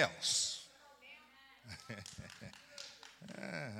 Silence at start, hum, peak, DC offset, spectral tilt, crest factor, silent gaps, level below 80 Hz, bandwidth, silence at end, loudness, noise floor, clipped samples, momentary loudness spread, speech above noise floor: 0 s; none; -14 dBFS; under 0.1%; -1.5 dB/octave; 28 dB; none; -76 dBFS; 17.5 kHz; 0 s; -40 LUFS; -63 dBFS; under 0.1%; 24 LU; 25 dB